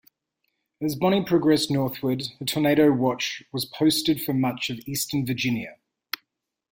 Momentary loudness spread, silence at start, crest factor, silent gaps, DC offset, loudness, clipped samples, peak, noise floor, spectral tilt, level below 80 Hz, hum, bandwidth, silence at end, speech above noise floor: 11 LU; 0.8 s; 16 dB; none; under 0.1%; -24 LUFS; under 0.1%; -8 dBFS; -81 dBFS; -5 dB/octave; -60 dBFS; none; 17 kHz; 1 s; 58 dB